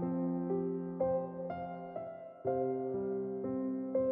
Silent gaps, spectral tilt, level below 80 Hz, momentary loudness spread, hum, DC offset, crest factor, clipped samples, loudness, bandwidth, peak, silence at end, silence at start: none; -10.5 dB/octave; -72 dBFS; 8 LU; none; under 0.1%; 14 dB; under 0.1%; -37 LUFS; 3.6 kHz; -22 dBFS; 0 s; 0 s